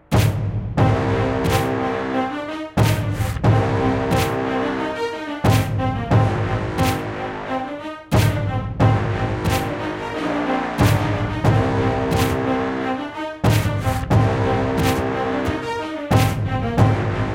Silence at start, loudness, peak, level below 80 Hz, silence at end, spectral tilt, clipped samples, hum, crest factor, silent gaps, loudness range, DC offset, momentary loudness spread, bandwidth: 0.1 s; -20 LUFS; -2 dBFS; -34 dBFS; 0 s; -6.5 dB/octave; under 0.1%; none; 18 dB; none; 2 LU; under 0.1%; 7 LU; 16.5 kHz